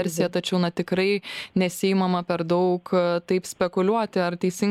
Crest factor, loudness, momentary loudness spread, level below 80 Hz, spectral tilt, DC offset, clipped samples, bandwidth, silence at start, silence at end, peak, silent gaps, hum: 16 dB; -24 LUFS; 3 LU; -64 dBFS; -5.5 dB/octave; under 0.1%; under 0.1%; 15.5 kHz; 0 s; 0 s; -8 dBFS; none; none